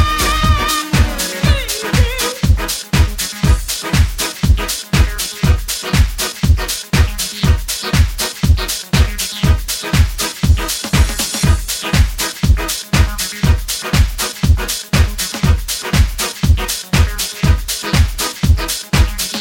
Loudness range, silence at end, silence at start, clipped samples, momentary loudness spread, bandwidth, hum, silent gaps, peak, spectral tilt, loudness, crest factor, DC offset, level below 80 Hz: 0 LU; 0 s; 0 s; under 0.1%; 2 LU; 18.5 kHz; none; none; 0 dBFS; -4 dB/octave; -16 LUFS; 14 dB; under 0.1%; -18 dBFS